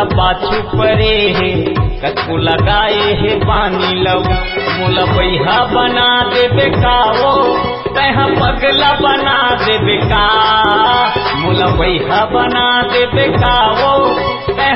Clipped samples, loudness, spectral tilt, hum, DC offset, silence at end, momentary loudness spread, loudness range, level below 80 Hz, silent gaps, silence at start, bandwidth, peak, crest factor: under 0.1%; -11 LUFS; -8.5 dB/octave; none; under 0.1%; 0 s; 5 LU; 2 LU; -26 dBFS; none; 0 s; 5.8 kHz; 0 dBFS; 12 dB